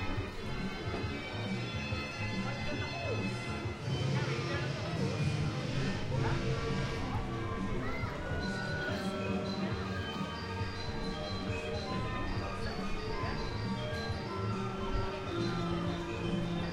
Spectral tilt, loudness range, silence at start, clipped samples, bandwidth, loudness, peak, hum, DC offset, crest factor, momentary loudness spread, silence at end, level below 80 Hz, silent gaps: -6 dB/octave; 3 LU; 0 s; under 0.1%; 12.5 kHz; -36 LUFS; -20 dBFS; none; under 0.1%; 14 dB; 4 LU; 0 s; -46 dBFS; none